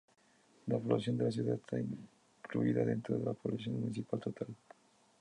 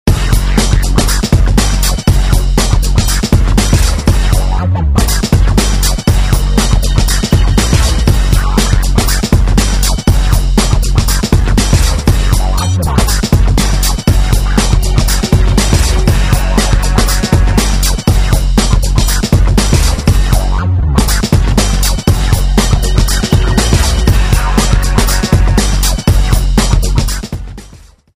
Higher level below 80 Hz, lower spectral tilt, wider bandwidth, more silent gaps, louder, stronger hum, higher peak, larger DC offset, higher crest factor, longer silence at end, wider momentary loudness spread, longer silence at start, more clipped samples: second, -72 dBFS vs -12 dBFS; first, -8 dB/octave vs -4.5 dB/octave; second, 10.5 kHz vs 16 kHz; neither; second, -37 LUFS vs -11 LUFS; neither; second, -18 dBFS vs 0 dBFS; neither; first, 20 dB vs 10 dB; first, 0.65 s vs 0.4 s; first, 13 LU vs 2 LU; first, 0.65 s vs 0.05 s; second, under 0.1% vs 0.1%